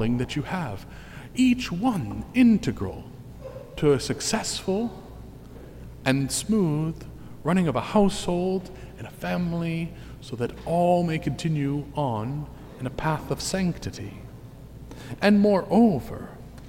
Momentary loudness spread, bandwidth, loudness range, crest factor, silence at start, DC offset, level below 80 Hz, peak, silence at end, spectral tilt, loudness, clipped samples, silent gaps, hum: 22 LU; 16.5 kHz; 4 LU; 18 dB; 0 s; under 0.1%; -46 dBFS; -8 dBFS; 0 s; -6 dB/octave; -25 LUFS; under 0.1%; none; none